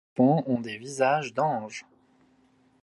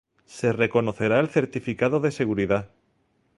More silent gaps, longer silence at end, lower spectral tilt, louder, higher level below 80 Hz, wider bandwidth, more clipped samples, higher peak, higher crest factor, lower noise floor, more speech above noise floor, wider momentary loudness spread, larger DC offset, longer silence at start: neither; first, 1 s vs 0.7 s; about the same, -6.5 dB/octave vs -7 dB/octave; about the same, -26 LUFS vs -24 LUFS; second, -74 dBFS vs -56 dBFS; about the same, 11.5 kHz vs 11.5 kHz; neither; about the same, -8 dBFS vs -6 dBFS; about the same, 20 dB vs 20 dB; second, -63 dBFS vs -68 dBFS; second, 38 dB vs 44 dB; first, 14 LU vs 5 LU; neither; second, 0.15 s vs 0.3 s